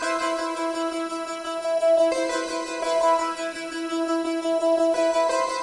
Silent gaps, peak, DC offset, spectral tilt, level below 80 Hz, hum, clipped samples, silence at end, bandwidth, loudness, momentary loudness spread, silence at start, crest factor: none; -10 dBFS; under 0.1%; -2 dB/octave; -64 dBFS; none; under 0.1%; 0 s; 11.5 kHz; -24 LUFS; 9 LU; 0 s; 12 dB